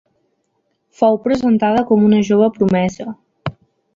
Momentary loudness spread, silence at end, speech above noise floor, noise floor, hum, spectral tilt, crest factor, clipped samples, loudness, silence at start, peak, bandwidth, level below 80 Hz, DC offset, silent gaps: 17 LU; 0.45 s; 53 dB; -67 dBFS; none; -7.5 dB/octave; 14 dB; under 0.1%; -15 LUFS; 1 s; -2 dBFS; 7.4 kHz; -50 dBFS; under 0.1%; none